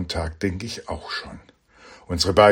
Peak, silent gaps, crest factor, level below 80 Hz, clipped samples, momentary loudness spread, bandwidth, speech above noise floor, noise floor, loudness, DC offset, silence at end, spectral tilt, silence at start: 0 dBFS; none; 22 dB; -40 dBFS; under 0.1%; 15 LU; 16 kHz; 28 dB; -49 dBFS; -25 LUFS; under 0.1%; 0 s; -4.5 dB/octave; 0 s